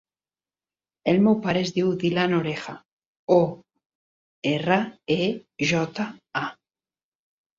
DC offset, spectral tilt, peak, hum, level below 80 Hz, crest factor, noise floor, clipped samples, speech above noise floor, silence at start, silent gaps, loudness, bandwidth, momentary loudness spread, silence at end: under 0.1%; -6 dB/octave; -6 dBFS; none; -64 dBFS; 20 dB; under -90 dBFS; under 0.1%; over 67 dB; 1.05 s; 2.93-2.97 s, 3.06-3.27 s, 3.86-4.42 s; -24 LUFS; 7.6 kHz; 12 LU; 1.05 s